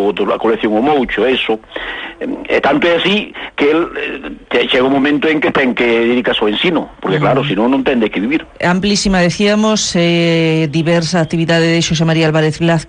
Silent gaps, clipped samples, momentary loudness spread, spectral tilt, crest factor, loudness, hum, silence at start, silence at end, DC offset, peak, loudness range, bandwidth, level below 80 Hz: none; under 0.1%; 7 LU; -5 dB/octave; 10 dB; -13 LUFS; none; 0 s; 0 s; under 0.1%; -2 dBFS; 2 LU; 10 kHz; -40 dBFS